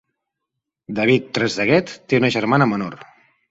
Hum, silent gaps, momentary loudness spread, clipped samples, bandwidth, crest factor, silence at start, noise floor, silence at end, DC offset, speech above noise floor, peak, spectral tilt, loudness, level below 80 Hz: none; none; 8 LU; under 0.1%; 8 kHz; 18 dB; 0.9 s; -81 dBFS; 0.45 s; under 0.1%; 62 dB; -2 dBFS; -6 dB/octave; -19 LUFS; -58 dBFS